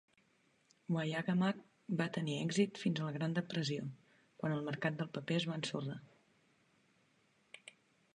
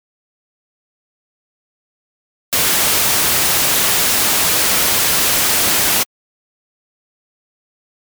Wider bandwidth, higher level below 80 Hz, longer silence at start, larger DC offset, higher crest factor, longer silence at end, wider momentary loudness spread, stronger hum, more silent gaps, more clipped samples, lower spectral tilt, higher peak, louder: second, 10.5 kHz vs over 20 kHz; second, -82 dBFS vs -44 dBFS; second, 0.9 s vs 2.5 s; neither; first, 20 dB vs 14 dB; second, 0.45 s vs 2 s; first, 18 LU vs 3 LU; neither; neither; neither; first, -6 dB/octave vs 0 dB/octave; second, -20 dBFS vs -4 dBFS; second, -38 LUFS vs -12 LUFS